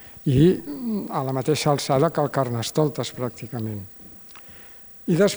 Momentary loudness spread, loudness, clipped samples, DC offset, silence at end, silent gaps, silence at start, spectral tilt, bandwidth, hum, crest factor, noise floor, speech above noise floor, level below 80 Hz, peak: 22 LU; -23 LUFS; under 0.1%; under 0.1%; 0 s; none; 0 s; -6 dB/octave; over 20 kHz; none; 18 dB; -44 dBFS; 22 dB; -52 dBFS; -6 dBFS